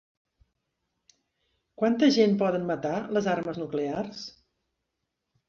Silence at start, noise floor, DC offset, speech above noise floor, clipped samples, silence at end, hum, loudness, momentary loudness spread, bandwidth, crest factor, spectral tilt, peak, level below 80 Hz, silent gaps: 1.8 s; -82 dBFS; under 0.1%; 57 dB; under 0.1%; 1.2 s; none; -26 LUFS; 13 LU; 7.4 kHz; 20 dB; -6 dB/octave; -10 dBFS; -68 dBFS; none